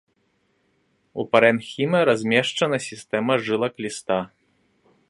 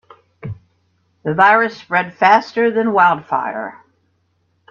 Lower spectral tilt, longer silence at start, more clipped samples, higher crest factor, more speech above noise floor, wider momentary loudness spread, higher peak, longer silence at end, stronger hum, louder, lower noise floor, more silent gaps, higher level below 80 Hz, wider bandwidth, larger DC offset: second, -4.5 dB/octave vs -6.5 dB/octave; first, 1.15 s vs 0.45 s; neither; about the same, 22 dB vs 18 dB; about the same, 46 dB vs 49 dB; second, 12 LU vs 21 LU; about the same, 0 dBFS vs 0 dBFS; second, 0.85 s vs 1 s; neither; second, -22 LUFS vs -15 LUFS; first, -68 dBFS vs -64 dBFS; neither; second, -66 dBFS vs -60 dBFS; first, 11.5 kHz vs 7.2 kHz; neither